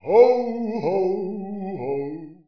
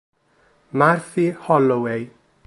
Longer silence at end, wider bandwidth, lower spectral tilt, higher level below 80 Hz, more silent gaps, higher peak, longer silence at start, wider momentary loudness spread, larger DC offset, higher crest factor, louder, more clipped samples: second, 0.15 s vs 0.4 s; second, 5.4 kHz vs 11.5 kHz; about the same, -8.5 dB/octave vs -7.5 dB/octave; about the same, -66 dBFS vs -66 dBFS; neither; about the same, -2 dBFS vs -2 dBFS; second, 0.05 s vs 0.75 s; first, 15 LU vs 12 LU; first, 0.4% vs under 0.1%; about the same, 18 dB vs 20 dB; about the same, -22 LUFS vs -20 LUFS; neither